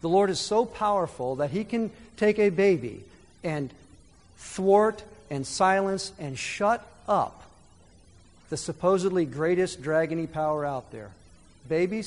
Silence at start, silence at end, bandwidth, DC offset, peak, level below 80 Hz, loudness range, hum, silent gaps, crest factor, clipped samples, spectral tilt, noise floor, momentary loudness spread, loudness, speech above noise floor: 0.05 s; 0 s; 11 kHz; under 0.1%; -8 dBFS; -58 dBFS; 2 LU; none; none; 20 dB; under 0.1%; -5 dB/octave; -56 dBFS; 14 LU; -26 LUFS; 30 dB